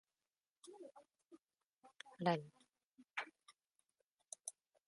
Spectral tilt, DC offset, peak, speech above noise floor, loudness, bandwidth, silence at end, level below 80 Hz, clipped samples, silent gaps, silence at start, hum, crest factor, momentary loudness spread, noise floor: -4.5 dB/octave; under 0.1%; -24 dBFS; over 46 dB; -45 LUFS; 11.5 kHz; 0.35 s; under -90 dBFS; under 0.1%; 1.66-1.77 s, 2.84-2.92 s, 4.04-4.18 s; 0.65 s; none; 28 dB; 23 LU; under -90 dBFS